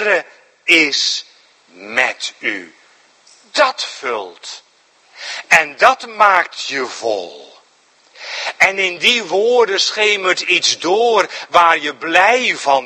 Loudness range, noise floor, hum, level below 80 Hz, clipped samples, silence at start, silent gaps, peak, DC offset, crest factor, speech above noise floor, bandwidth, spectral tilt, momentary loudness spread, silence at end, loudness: 7 LU; -53 dBFS; none; -64 dBFS; 0.2%; 0 s; none; 0 dBFS; under 0.1%; 16 dB; 37 dB; 16 kHz; -1 dB/octave; 15 LU; 0 s; -14 LUFS